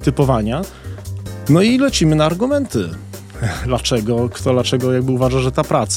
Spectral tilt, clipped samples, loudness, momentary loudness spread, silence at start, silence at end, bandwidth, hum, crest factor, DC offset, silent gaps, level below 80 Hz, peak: -5.5 dB/octave; under 0.1%; -17 LUFS; 15 LU; 0 s; 0 s; 16.5 kHz; none; 16 dB; under 0.1%; none; -34 dBFS; -2 dBFS